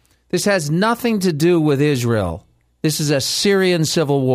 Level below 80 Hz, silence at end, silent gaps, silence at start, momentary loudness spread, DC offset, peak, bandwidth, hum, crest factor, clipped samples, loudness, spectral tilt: -48 dBFS; 0 s; none; 0.35 s; 7 LU; under 0.1%; -4 dBFS; 16 kHz; none; 14 dB; under 0.1%; -17 LUFS; -5 dB/octave